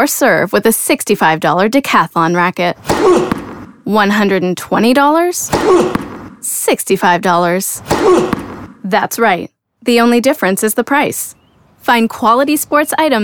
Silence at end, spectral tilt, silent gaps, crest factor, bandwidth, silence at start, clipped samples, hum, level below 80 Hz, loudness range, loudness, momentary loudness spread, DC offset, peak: 0 s; -4 dB/octave; none; 12 dB; over 20 kHz; 0 s; under 0.1%; none; -44 dBFS; 2 LU; -12 LUFS; 11 LU; 0.2%; 0 dBFS